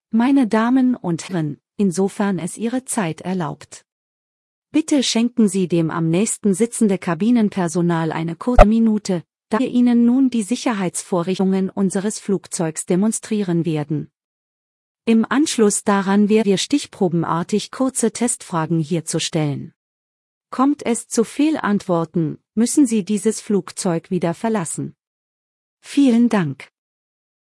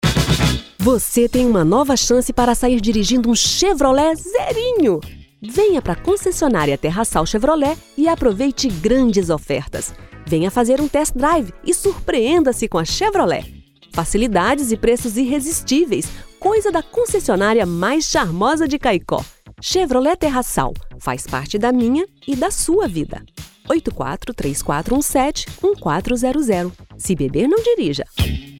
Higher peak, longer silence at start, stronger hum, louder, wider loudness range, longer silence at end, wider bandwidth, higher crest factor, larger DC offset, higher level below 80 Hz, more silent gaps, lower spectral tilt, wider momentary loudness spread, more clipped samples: about the same, 0 dBFS vs 0 dBFS; about the same, 0.15 s vs 0.05 s; neither; about the same, -19 LUFS vs -17 LUFS; about the same, 5 LU vs 4 LU; first, 0.85 s vs 0 s; second, 12 kHz vs 18 kHz; about the same, 18 dB vs 18 dB; neither; about the same, -34 dBFS vs -32 dBFS; first, 3.92-4.62 s, 14.24-14.95 s, 19.76-20.41 s, 25.07-25.77 s vs none; about the same, -5.5 dB/octave vs -4.5 dB/octave; about the same, 8 LU vs 9 LU; neither